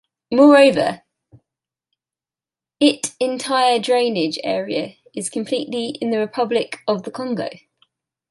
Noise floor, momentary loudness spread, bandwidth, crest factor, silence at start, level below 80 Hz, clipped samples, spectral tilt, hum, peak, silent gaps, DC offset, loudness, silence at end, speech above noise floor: under -90 dBFS; 14 LU; 11.5 kHz; 18 dB; 0.3 s; -66 dBFS; under 0.1%; -4 dB/octave; none; -2 dBFS; none; under 0.1%; -18 LUFS; 0.75 s; over 72 dB